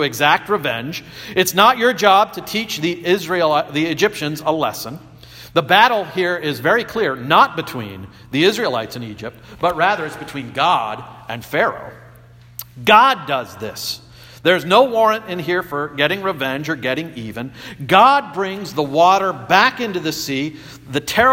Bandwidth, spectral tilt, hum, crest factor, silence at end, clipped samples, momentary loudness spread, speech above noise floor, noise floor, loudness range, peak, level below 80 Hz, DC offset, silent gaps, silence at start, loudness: 17 kHz; -4 dB/octave; none; 18 dB; 0 s; under 0.1%; 17 LU; 26 dB; -44 dBFS; 4 LU; 0 dBFS; -54 dBFS; under 0.1%; none; 0 s; -17 LUFS